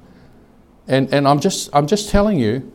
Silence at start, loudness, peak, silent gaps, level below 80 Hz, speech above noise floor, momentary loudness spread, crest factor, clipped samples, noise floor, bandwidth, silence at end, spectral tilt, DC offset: 0.85 s; -17 LUFS; 0 dBFS; none; -34 dBFS; 32 dB; 4 LU; 18 dB; under 0.1%; -48 dBFS; 16.5 kHz; 0.05 s; -5.5 dB/octave; under 0.1%